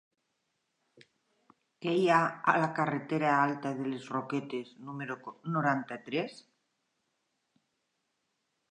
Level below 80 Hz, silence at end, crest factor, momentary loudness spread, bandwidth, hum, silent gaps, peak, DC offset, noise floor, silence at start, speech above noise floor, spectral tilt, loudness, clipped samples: -86 dBFS; 2.3 s; 24 dB; 14 LU; 10.5 kHz; none; none; -10 dBFS; under 0.1%; -81 dBFS; 1.8 s; 50 dB; -6.5 dB/octave; -31 LUFS; under 0.1%